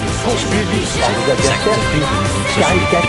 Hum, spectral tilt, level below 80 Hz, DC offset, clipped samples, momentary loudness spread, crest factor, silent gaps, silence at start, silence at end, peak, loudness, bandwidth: none; -4.5 dB/octave; -28 dBFS; under 0.1%; under 0.1%; 3 LU; 14 dB; none; 0 s; 0 s; 0 dBFS; -15 LUFS; 11.5 kHz